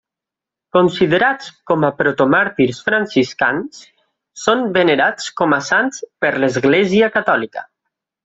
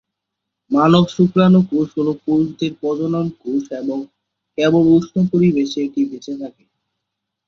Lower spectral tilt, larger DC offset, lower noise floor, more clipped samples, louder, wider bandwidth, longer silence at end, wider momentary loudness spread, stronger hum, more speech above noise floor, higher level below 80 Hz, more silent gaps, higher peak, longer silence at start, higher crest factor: second, -5 dB/octave vs -8 dB/octave; neither; first, -86 dBFS vs -80 dBFS; neither; about the same, -16 LUFS vs -17 LUFS; first, 8 kHz vs 7.2 kHz; second, 0.6 s vs 0.95 s; second, 7 LU vs 15 LU; neither; first, 70 dB vs 64 dB; about the same, -56 dBFS vs -54 dBFS; neither; about the same, 0 dBFS vs -2 dBFS; about the same, 0.75 s vs 0.7 s; about the same, 16 dB vs 16 dB